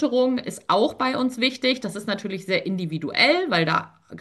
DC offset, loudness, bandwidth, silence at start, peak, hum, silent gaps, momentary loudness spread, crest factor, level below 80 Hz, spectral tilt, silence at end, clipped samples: under 0.1%; -22 LUFS; 12.5 kHz; 0 s; -4 dBFS; none; none; 10 LU; 18 dB; -66 dBFS; -5 dB/octave; 0 s; under 0.1%